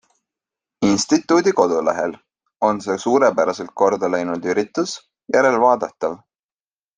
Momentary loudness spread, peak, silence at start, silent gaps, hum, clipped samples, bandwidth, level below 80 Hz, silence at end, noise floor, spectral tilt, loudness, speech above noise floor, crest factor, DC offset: 10 LU; -2 dBFS; 0.8 s; none; none; under 0.1%; 9.8 kHz; -60 dBFS; 0.8 s; under -90 dBFS; -4.5 dB/octave; -19 LUFS; over 72 dB; 18 dB; under 0.1%